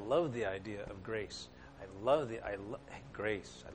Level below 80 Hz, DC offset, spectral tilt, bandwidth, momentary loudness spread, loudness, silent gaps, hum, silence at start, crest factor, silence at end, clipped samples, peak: -60 dBFS; under 0.1%; -5.5 dB/octave; 9.6 kHz; 16 LU; -39 LUFS; none; none; 0 s; 20 dB; 0 s; under 0.1%; -18 dBFS